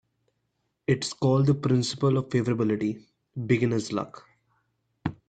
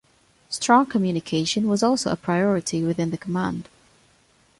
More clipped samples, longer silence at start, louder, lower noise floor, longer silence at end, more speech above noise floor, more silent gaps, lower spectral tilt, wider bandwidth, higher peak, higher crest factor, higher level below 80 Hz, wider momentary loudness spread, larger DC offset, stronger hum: neither; first, 0.9 s vs 0.5 s; second, -26 LUFS vs -22 LUFS; first, -77 dBFS vs -60 dBFS; second, 0.15 s vs 0.95 s; first, 52 dB vs 38 dB; neither; first, -6.5 dB/octave vs -5 dB/octave; second, 9.2 kHz vs 11.5 kHz; second, -8 dBFS vs -4 dBFS; about the same, 18 dB vs 18 dB; about the same, -62 dBFS vs -58 dBFS; first, 13 LU vs 9 LU; neither; neither